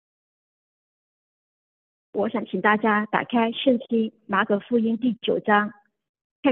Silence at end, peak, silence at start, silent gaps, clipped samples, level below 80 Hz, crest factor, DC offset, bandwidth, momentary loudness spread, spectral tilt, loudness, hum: 0 s; -4 dBFS; 2.15 s; 6.09-6.14 s, 6.24-6.43 s; under 0.1%; -74 dBFS; 22 dB; under 0.1%; 4.1 kHz; 6 LU; -9 dB/octave; -23 LUFS; none